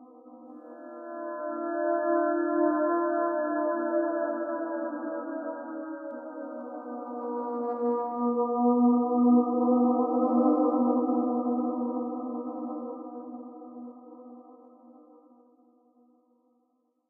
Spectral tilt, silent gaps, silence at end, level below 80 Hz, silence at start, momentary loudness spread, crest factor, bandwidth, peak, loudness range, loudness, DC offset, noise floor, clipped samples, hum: -11.5 dB/octave; none; 2.15 s; under -90 dBFS; 0 s; 20 LU; 18 dB; 1.9 kHz; -12 dBFS; 14 LU; -28 LUFS; under 0.1%; -73 dBFS; under 0.1%; none